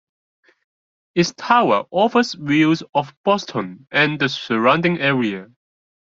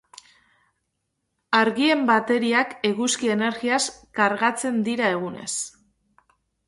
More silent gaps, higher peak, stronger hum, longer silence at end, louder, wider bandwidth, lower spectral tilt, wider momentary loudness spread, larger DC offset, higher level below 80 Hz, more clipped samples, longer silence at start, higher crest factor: first, 2.89-2.93 s, 3.17-3.24 s vs none; about the same, -2 dBFS vs -4 dBFS; neither; second, 0.65 s vs 1 s; first, -18 LUFS vs -22 LUFS; second, 7.6 kHz vs 11.5 kHz; first, -5.5 dB/octave vs -3 dB/octave; about the same, 8 LU vs 9 LU; neither; first, -62 dBFS vs -68 dBFS; neither; second, 1.15 s vs 1.5 s; about the same, 18 dB vs 20 dB